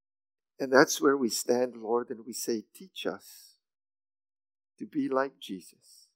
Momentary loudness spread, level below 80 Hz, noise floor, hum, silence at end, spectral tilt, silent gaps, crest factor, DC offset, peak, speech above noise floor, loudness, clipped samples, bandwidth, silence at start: 19 LU; -90 dBFS; under -90 dBFS; none; 0.55 s; -3 dB/octave; none; 26 dB; under 0.1%; -4 dBFS; over 60 dB; -29 LUFS; under 0.1%; 16 kHz; 0.6 s